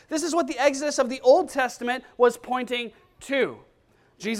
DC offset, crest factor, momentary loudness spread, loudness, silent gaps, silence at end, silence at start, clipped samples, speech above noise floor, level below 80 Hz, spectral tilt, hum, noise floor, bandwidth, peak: under 0.1%; 18 dB; 10 LU; -24 LUFS; none; 0 s; 0.1 s; under 0.1%; 38 dB; -64 dBFS; -3 dB/octave; none; -61 dBFS; 15 kHz; -6 dBFS